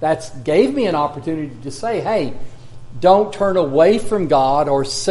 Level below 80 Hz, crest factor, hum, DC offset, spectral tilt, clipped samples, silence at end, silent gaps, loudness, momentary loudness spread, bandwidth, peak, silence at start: -42 dBFS; 16 dB; none; under 0.1%; -5.5 dB/octave; under 0.1%; 0 s; none; -17 LUFS; 11 LU; 11.5 kHz; 0 dBFS; 0 s